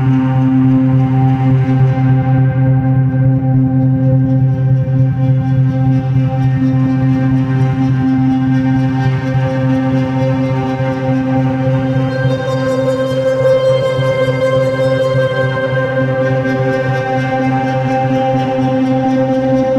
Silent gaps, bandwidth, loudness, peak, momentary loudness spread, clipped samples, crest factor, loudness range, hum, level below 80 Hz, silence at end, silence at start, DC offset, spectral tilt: none; 6.6 kHz; -13 LUFS; -2 dBFS; 3 LU; under 0.1%; 10 dB; 3 LU; none; -40 dBFS; 0 s; 0 s; under 0.1%; -9 dB/octave